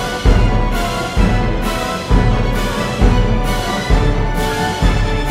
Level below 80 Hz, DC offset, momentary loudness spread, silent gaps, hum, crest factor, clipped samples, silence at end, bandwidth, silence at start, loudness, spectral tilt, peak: -16 dBFS; under 0.1%; 4 LU; none; none; 14 dB; under 0.1%; 0 s; 15.5 kHz; 0 s; -16 LUFS; -5.5 dB/octave; 0 dBFS